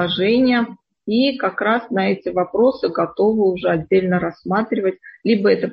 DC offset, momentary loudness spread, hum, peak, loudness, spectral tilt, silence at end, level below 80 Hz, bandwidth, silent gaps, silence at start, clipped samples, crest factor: under 0.1%; 6 LU; none; -4 dBFS; -18 LUFS; -9 dB/octave; 0 s; -54 dBFS; 5.6 kHz; none; 0 s; under 0.1%; 14 dB